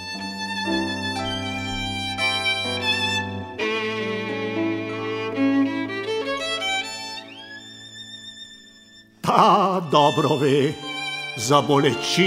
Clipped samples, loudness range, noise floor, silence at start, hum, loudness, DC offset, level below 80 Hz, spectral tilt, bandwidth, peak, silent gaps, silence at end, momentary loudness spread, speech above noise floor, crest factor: under 0.1%; 6 LU; -50 dBFS; 0 s; none; -22 LUFS; under 0.1%; -52 dBFS; -4.5 dB/octave; 16 kHz; 0 dBFS; none; 0 s; 18 LU; 31 dB; 22 dB